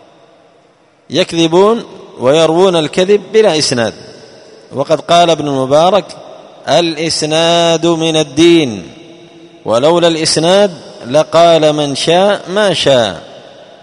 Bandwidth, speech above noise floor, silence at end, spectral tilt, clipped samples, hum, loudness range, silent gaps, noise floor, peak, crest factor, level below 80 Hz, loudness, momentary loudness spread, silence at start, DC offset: 11 kHz; 38 dB; 0.45 s; -4 dB/octave; 0.2%; none; 2 LU; none; -48 dBFS; 0 dBFS; 12 dB; -52 dBFS; -10 LUFS; 10 LU; 1.1 s; under 0.1%